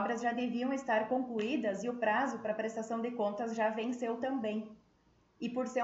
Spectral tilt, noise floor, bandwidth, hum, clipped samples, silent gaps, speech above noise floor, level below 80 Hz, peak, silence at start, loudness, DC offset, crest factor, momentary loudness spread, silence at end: -5 dB/octave; -69 dBFS; 8 kHz; none; under 0.1%; none; 35 dB; -76 dBFS; -20 dBFS; 0 s; -35 LUFS; under 0.1%; 16 dB; 6 LU; 0 s